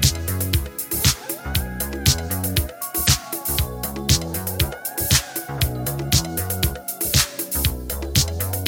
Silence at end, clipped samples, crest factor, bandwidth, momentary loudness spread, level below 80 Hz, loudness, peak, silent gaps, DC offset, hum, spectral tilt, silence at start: 0 s; under 0.1%; 20 dB; 17 kHz; 7 LU; -30 dBFS; -21 LUFS; -2 dBFS; none; under 0.1%; none; -3 dB/octave; 0 s